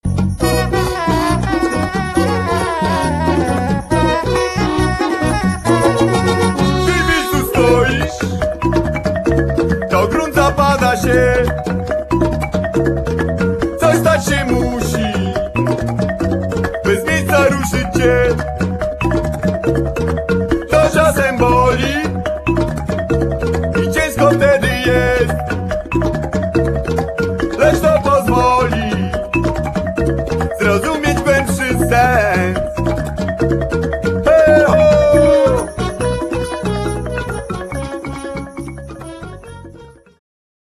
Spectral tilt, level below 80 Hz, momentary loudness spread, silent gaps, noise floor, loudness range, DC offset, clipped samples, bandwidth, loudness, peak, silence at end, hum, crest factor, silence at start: -6 dB/octave; -26 dBFS; 8 LU; none; -39 dBFS; 3 LU; under 0.1%; under 0.1%; 14 kHz; -15 LUFS; 0 dBFS; 0.85 s; none; 14 dB; 0.05 s